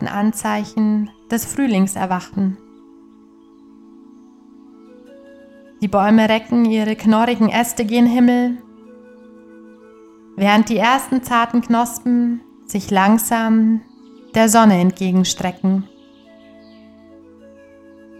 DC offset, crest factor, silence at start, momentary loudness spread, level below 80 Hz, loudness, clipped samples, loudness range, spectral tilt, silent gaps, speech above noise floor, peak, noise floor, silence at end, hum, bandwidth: under 0.1%; 18 dB; 0 s; 10 LU; -54 dBFS; -16 LUFS; under 0.1%; 8 LU; -5 dB/octave; none; 31 dB; 0 dBFS; -46 dBFS; 2.35 s; none; 15 kHz